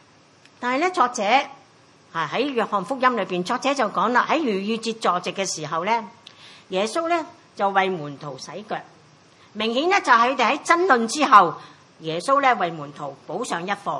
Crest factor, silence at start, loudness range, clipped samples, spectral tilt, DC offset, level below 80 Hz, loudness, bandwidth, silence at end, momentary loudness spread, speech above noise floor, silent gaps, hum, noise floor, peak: 22 dB; 0.6 s; 7 LU; under 0.1%; -3.5 dB/octave; under 0.1%; -78 dBFS; -21 LUFS; 11.5 kHz; 0 s; 16 LU; 32 dB; none; none; -53 dBFS; 0 dBFS